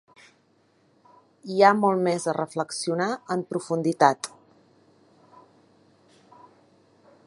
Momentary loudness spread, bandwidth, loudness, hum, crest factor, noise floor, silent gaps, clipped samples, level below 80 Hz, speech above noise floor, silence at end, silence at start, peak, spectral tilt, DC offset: 12 LU; 11.5 kHz; -24 LUFS; none; 26 dB; -64 dBFS; none; under 0.1%; -78 dBFS; 41 dB; 3 s; 1.45 s; -2 dBFS; -5 dB/octave; under 0.1%